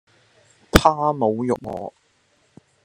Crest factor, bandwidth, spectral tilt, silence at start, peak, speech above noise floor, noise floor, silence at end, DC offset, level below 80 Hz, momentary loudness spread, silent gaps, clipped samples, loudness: 22 dB; 13 kHz; -5 dB/octave; 0.75 s; 0 dBFS; 42 dB; -63 dBFS; 0.95 s; under 0.1%; -34 dBFS; 16 LU; none; under 0.1%; -20 LUFS